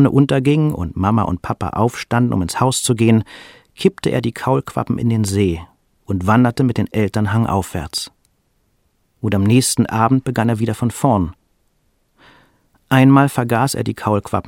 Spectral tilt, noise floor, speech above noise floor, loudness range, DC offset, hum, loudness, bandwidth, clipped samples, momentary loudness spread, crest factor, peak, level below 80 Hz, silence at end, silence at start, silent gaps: -6 dB/octave; -63 dBFS; 47 dB; 2 LU; under 0.1%; none; -17 LUFS; 16.5 kHz; under 0.1%; 9 LU; 16 dB; 0 dBFS; -42 dBFS; 0 s; 0 s; none